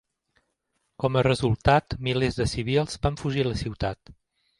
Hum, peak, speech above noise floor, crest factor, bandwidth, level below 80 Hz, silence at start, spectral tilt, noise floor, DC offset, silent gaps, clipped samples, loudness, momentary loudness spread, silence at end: none; -4 dBFS; 51 dB; 22 dB; 11.5 kHz; -42 dBFS; 1 s; -6 dB/octave; -76 dBFS; under 0.1%; none; under 0.1%; -25 LUFS; 8 LU; 0.45 s